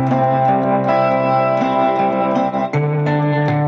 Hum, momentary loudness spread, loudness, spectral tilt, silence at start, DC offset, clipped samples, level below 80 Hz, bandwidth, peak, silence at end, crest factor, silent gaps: none; 3 LU; -16 LUFS; -9 dB/octave; 0 s; under 0.1%; under 0.1%; -56 dBFS; 7 kHz; -4 dBFS; 0 s; 12 dB; none